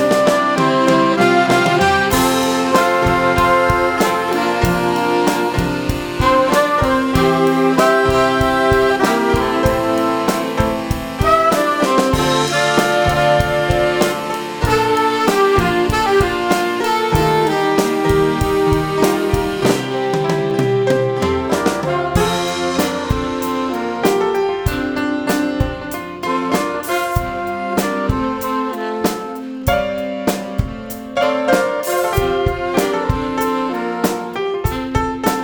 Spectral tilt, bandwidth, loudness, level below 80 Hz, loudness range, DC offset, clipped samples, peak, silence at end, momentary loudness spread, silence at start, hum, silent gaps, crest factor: -5 dB/octave; over 20 kHz; -16 LUFS; -32 dBFS; 6 LU; under 0.1%; under 0.1%; 0 dBFS; 0 s; 7 LU; 0 s; none; none; 16 dB